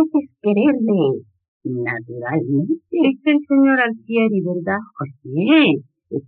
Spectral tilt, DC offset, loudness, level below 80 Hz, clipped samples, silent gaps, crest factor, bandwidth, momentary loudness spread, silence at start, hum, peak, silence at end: -5 dB/octave; under 0.1%; -18 LUFS; -70 dBFS; under 0.1%; 1.48-1.60 s; 16 dB; 4.3 kHz; 13 LU; 0 s; none; -2 dBFS; 0.05 s